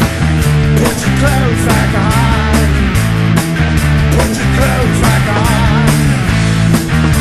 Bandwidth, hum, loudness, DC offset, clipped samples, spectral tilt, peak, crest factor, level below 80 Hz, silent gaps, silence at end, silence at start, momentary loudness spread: 13 kHz; none; -11 LUFS; 0.7%; under 0.1%; -5.5 dB/octave; 0 dBFS; 10 dB; -18 dBFS; none; 0 s; 0 s; 2 LU